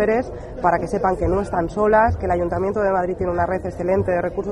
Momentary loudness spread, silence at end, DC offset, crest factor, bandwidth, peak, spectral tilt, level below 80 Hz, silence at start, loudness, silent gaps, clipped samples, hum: 6 LU; 0 s; under 0.1%; 16 dB; 11.5 kHz; -4 dBFS; -8 dB/octave; -36 dBFS; 0 s; -20 LUFS; none; under 0.1%; none